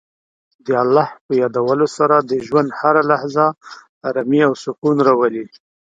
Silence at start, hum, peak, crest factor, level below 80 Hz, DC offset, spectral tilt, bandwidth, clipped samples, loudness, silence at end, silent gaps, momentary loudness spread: 0.65 s; none; 0 dBFS; 16 dB; -64 dBFS; under 0.1%; -6.5 dB/octave; 7.8 kHz; under 0.1%; -16 LUFS; 0.45 s; 1.21-1.29 s, 3.89-4.01 s, 4.78-4.82 s; 9 LU